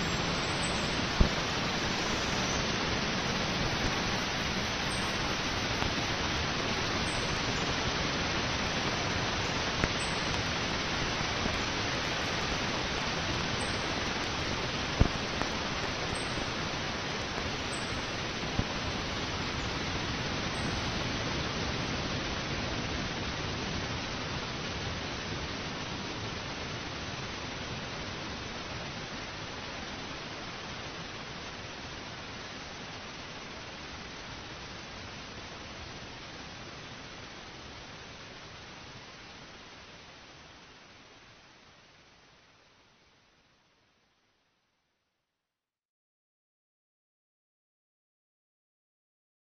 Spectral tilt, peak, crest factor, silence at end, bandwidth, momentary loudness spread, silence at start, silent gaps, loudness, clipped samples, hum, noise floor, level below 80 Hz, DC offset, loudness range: -3.5 dB/octave; -6 dBFS; 30 dB; 7.15 s; 15.5 kHz; 14 LU; 0 s; none; -33 LUFS; under 0.1%; none; under -90 dBFS; -46 dBFS; under 0.1%; 14 LU